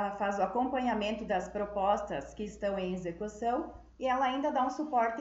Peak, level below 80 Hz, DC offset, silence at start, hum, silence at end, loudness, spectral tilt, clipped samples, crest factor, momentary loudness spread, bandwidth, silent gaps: -16 dBFS; -56 dBFS; under 0.1%; 0 s; none; 0 s; -33 LUFS; -5.5 dB/octave; under 0.1%; 18 dB; 7 LU; 8 kHz; none